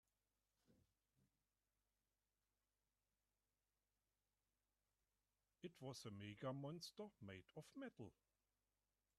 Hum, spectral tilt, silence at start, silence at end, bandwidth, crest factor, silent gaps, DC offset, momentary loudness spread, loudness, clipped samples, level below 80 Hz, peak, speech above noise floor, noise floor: 50 Hz at -90 dBFS; -5.5 dB/octave; 0.7 s; 1.05 s; 11.5 kHz; 24 dB; none; under 0.1%; 10 LU; -57 LUFS; under 0.1%; -90 dBFS; -38 dBFS; over 34 dB; under -90 dBFS